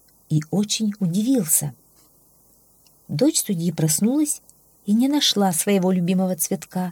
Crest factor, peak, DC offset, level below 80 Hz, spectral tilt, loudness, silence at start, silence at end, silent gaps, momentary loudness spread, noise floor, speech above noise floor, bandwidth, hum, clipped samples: 18 dB; -4 dBFS; under 0.1%; -66 dBFS; -4.5 dB/octave; -21 LUFS; 0.3 s; 0 s; none; 8 LU; -56 dBFS; 36 dB; 19.5 kHz; none; under 0.1%